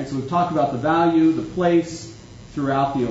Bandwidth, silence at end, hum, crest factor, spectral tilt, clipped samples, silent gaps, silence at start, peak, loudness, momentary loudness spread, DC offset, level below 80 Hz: 8 kHz; 0 s; none; 14 dB; -7 dB/octave; under 0.1%; none; 0 s; -6 dBFS; -20 LUFS; 15 LU; under 0.1%; -50 dBFS